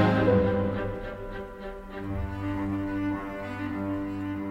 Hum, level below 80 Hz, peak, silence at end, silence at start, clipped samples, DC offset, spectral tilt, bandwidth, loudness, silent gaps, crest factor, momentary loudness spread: none; -44 dBFS; -10 dBFS; 0 s; 0 s; under 0.1%; under 0.1%; -8.5 dB/octave; 9.4 kHz; -30 LUFS; none; 20 dB; 15 LU